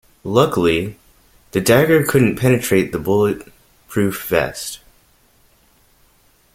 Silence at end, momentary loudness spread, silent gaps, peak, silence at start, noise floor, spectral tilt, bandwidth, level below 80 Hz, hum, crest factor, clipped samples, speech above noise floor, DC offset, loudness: 1.8 s; 14 LU; none; 0 dBFS; 0.25 s; -55 dBFS; -5.5 dB/octave; 16.5 kHz; -48 dBFS; none; 18 dB; under 0.1%; 39 dB; under 0.1%; -17 LUFS